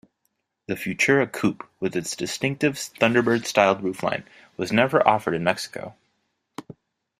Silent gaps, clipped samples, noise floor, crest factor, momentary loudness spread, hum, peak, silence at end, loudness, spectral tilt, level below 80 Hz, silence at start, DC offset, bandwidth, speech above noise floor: none; under 0.1%; -75 dBFS; 24 dB; 19 LU; none; 0 dBFS; 0.45 s; -23 LUFS; -4.5 dB/octave; -62 dBFS; 0.7 s; under 0.1%; 15.5 kHz; 52 dB